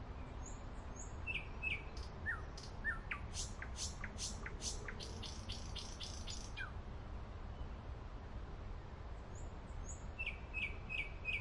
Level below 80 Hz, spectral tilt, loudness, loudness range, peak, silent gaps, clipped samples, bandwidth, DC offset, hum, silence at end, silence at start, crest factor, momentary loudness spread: -50 dBFS; -3 dB/octave; -46 LUFS; 6 LU; -28 dBFS; none; under 0.1%; 11.5 kHz; under 0.1%; none; 0 s; 0 s; 18 dB; 10 LU